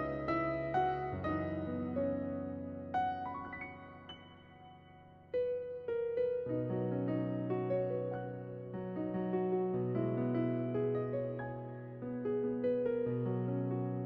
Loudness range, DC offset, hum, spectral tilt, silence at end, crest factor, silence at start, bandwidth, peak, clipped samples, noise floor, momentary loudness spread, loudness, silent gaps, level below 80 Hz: 5 LU; under 0.1%; none; -7.5 dB/octave; 0 s; 14 dB; 0 s; 5.6 kHz; -22 dBFS; under 0.1%; -58 dBFS; 11 LU; -37 LUFS; none; -64 dBFS